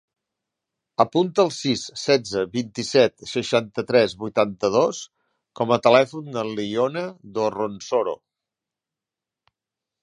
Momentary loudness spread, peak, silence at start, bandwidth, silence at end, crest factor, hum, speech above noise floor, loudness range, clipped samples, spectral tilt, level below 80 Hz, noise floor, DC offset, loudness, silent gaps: 10 LU; -2 dBFS; 1 s; 11 kHz; 1.85 s; 22 dB; none; 67 dB; 6 LU; under 0.1%; -4.5 dB/octave; -64 dBFS; -88 dBFS; under 0.1%; -22 LUFS; none